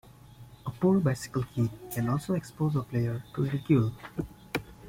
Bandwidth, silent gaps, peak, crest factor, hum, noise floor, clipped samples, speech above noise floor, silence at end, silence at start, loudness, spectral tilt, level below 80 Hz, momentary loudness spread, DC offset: 16.5 kHz; none; -12 dBFS; 18 dB; none; -51 dBFS; under 0.1%; 23 dB; 0 s; 0.4 s; -30 LUFS; -7.5 dB/octave; -56 dBFS; 12 LU; under 0.1%